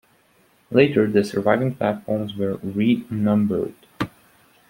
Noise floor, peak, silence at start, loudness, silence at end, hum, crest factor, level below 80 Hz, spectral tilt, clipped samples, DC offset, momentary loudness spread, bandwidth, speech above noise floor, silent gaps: -59 dBFS; -2 dBFS; 0.7 s; -22 LUFS; 0.6 s; none; 20 dB; -58 dBFS; -7.5 dB/octave; under 0.1%; under 0.1%; 13 LU; 16.5 kHz; 39 dB; none